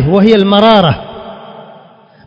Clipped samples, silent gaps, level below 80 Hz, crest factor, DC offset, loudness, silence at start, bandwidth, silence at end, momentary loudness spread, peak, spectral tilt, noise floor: 0.8%; none; -36 dBFS; 10 dB; under 0.1%; -8 LUFS; 0 s; 7 kHz; 0.65 s; 23 LU; 0 dBFS; -8 dB/octave; -40 dBFS